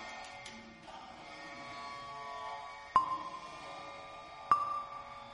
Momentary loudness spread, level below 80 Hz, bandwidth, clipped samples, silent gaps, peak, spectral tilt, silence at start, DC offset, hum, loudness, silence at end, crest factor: 17 LU; -70 dBFS; 11 kHz; under 0.1%; none; -14 dBFS; -3 dB/octave; 0 s; under 0.1%; none; -39 LUFS; 0 s; 26 dB